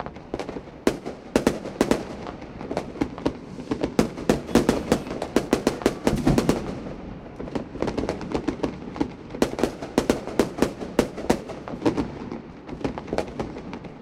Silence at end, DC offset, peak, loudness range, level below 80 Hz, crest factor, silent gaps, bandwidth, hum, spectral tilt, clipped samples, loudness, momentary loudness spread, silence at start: 0 s; under 0.1%; -2 dBFS; 4 LU; -42 dBFS; 24 dB; none; 16.5 kHz; none; -5.5 dB/octave; under 0.1%; -27 LUFS; 13 LU; 0 s